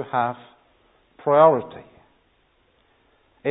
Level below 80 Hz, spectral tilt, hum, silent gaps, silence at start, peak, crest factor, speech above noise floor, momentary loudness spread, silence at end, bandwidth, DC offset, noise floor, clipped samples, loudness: -68 dBFS; -11 dB/octave; none; none; 0 s; -2 dBFS; 22 dB; 44 dB; 22 LU; 0 s; 4 kHz; under 0.1%; -63 dBFS; under 0.1%; -20 LUFS